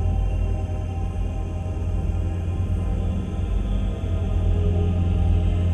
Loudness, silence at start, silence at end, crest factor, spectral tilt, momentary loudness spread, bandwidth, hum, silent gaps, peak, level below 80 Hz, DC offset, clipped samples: -25 LUFS; 0 s; 0 s; 12 dB; -8.5 dB/octave; 6 LU; 6.6 kHz; none; none; -10 dBFS; -26 dBFS; under 0.1%; under 0.1%